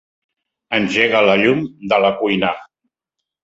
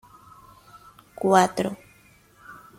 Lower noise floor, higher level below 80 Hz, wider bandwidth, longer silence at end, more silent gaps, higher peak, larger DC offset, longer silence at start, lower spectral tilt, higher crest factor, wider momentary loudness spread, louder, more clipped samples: first, -81 dBFS vs -56 dBFS; first, -56 dBFS vs -64 dBFS; second, 8 kHz vs 16 kHz; first, 0.8 s vs 0.25 s; neither; first, 0 dBFS vs -4 dBFS; neither; second, 0.7 s vs 1.2 s; about the same, -5.5 dB/octave vs -5 dB/octave; second, 18 dB vs 24 dB; second, 9 LU vs 27 LU; first, -16 LUFS vs -22 LUFS; neither